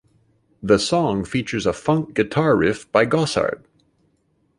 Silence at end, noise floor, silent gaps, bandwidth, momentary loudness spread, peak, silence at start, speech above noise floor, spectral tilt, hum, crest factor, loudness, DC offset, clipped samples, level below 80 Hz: 1 s; -65 dBFS; none; 11.5 kHz; 6 LU; -2 dBFS; 0.65 s; 46 dB; -5.5 dB/octave; none; 18 dB; -20 LUFS; under 0.1%; under 0.1%; -48 dBFS